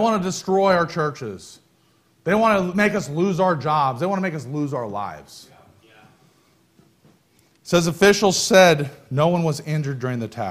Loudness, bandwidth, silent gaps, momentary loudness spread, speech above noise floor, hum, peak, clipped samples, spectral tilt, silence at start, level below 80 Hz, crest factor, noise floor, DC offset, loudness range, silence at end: -20 LUFS; 15.5 kHz; none; 13 LU; 40 dB; none; -2 dBFS; under 0.1%; -5 dB/octave; 0 s; -56 dBFS; 20 dB; -60 dBFS; under 0.1%; 11 LU; 0 s